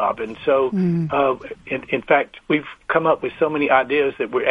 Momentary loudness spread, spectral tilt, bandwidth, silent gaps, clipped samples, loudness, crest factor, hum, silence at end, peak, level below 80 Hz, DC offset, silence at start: 7 LU; -8 dB/octave; 6.2 kHz; none; under 0.1%; -20 LUFS; 18 dB; none; 0 s; -2 dBFS; -56 dBFS; under 0.1%; 0 s